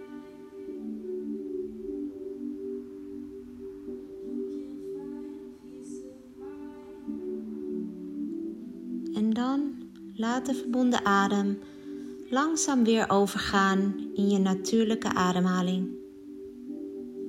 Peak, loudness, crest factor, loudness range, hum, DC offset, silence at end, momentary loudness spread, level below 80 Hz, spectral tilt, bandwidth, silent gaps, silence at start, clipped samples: -10 dBFS; -29 LUFS; 20 dB; 14 LU; none; under 0.1%; 0 s; 19 LU; -62 dBFS; -5 dB/octave; 15.5 kHz; none; 0 s; under 0.1%